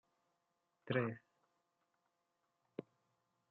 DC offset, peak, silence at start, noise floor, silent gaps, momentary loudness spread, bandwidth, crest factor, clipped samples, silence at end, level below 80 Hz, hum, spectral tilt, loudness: under 0.1%; -22 dBFS; 0.85 s; -86 dBFS; none; 15 LU; 4.6 kHz; 26 dB; under 0.1%; 0.7 s; under -90 dBFS; none; -5.5 dB/octave; -43 LUFS